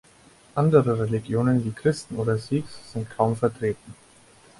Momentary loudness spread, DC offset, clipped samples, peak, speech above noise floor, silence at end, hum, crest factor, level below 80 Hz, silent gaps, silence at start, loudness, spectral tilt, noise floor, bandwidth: 13 LU; under 0.1%; under 0.1%; -4 dBFS; 30 dB; 0.65 s; none; 20 dB; -56 dBFS; none; 0.55 s; -24 LUFS; -7.5 dB/octave; -54 dBFS; 11.5 kHz